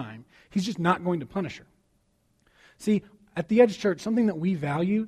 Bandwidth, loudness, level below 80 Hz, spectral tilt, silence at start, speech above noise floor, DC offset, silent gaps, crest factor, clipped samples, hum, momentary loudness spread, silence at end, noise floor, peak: 12.5 kHz; -26 LUFS; -64 dBFS; -7 dB/octave; 0 s; 44 dB; under 0.1%; none; 20 dB; under 0.1%; none; 15 LU; 0 s; -69 dBFS; -6 dBFS